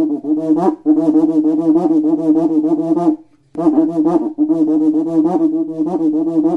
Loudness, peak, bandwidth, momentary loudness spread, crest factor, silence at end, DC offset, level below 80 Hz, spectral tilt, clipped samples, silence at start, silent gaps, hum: -15 LUFS; 0 dBFS; 2 kHz; 5 LU; 14 dB; 0 s; under 0.1%; -60 dBFS; -10 dB/octave; under 0.1%; 0 s; none; none